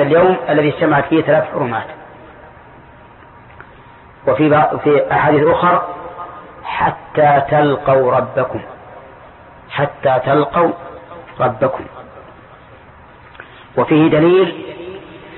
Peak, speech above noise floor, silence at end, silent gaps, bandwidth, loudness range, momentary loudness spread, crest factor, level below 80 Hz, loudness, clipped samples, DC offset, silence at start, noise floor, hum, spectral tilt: -2 dBFS; 27 dB; 0 s; none; 4.3 kHz; 6 LU; 20 LU; 14 dB; -48 dBFS; -14 LUFS; under 0.1%; under 0.1%; 0 s; -41 dBFS; none; -12 dB/octave